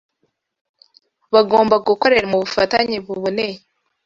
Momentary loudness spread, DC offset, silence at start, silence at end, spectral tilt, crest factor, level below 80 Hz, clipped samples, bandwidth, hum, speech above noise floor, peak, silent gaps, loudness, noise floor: 9 LU; under 0.1%; 1.3 s; 0.5 s; -5 dB/octave; 18 dB; -54 dBFS; under 0.1%; 7.6 kHz; none; 53 dB; 0 dBFS; none; -17 LUFS; -70 dBFS